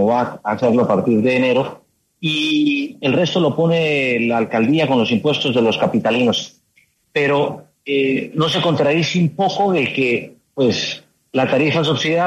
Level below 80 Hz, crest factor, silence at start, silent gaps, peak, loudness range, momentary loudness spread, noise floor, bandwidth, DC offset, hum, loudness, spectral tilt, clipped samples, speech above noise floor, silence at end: -60 dBFS; 14 dB; 0 s; none; -4 dBFS; 2 LU; 7 LU; -59 dBFS; 12.5 kHz; under 0.1%; none; -17 LUFS; -5.5 dB/octave; under 0.1%; 42 dB; 0 s